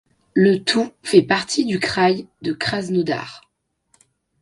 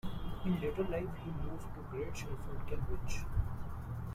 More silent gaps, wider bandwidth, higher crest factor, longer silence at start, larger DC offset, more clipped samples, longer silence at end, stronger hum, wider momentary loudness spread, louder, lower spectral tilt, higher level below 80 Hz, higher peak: neither; second, 11.5 kHz vs 15 kHz; about the same, 20 dB vs 16 dB; first, 0.35 s vs 0.05 s; neither; neither; first, 1.05 s vs 0 s; neither; about the same, 9 LU vs 8 LU; first, -19 LUFS vs -41 LUFS; second, -5 dB/octave vs -7 dB/octave; second, -58 dBFS vs -44 dBFS; first, 0 dBFS vs -20 dBFS